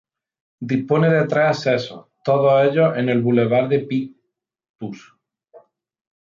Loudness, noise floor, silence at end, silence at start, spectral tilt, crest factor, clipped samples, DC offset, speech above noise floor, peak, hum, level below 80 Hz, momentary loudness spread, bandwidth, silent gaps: -18 LUFS; -74 dBFS; 0.6 s; 0.6 s; -7.5 dB/octave; 16 dB; under 0.1%; under 0.1%; 56 dB; -4 dBFS; none; -64 dBFS; 18 LU; 7.4 kHz; 4.69-4.74 s